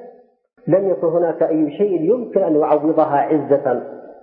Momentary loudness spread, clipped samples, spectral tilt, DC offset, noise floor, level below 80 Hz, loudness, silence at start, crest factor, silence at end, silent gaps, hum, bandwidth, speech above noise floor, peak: 5 LU; under 0.1%; -13 dB/octave; under 0.1%; -45 dBFS; -70 dBFS; -17 LUFS; 0 s; 14 dB; 0.1 s; none; none; 3.6 kHz; 28 dB; -2 dBFS